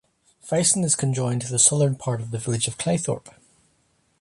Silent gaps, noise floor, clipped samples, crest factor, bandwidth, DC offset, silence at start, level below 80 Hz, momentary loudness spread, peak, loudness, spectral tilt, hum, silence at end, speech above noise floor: none; -66 dBFS; under 0.1%; 20 dB; 11.5 kHz; under 0.1%; 0.45 s; -58 dBFS; 11 LU; -4 dBFS; -22 LUFS; -4 dB/octave; none; 0.9 s; 43 dB